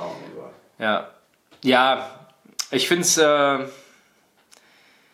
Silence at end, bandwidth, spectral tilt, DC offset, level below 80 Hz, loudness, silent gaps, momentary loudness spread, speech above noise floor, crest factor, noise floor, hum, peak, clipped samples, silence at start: 1.4 s; 16 kHz; -2 dB/octave; under 0.1%; -74 dBFS; -20 LUFS; none; 22 LU; 41 dB; 20 dB; -61 dBFS; none; -2 dBFS; under 0.1%; 0 s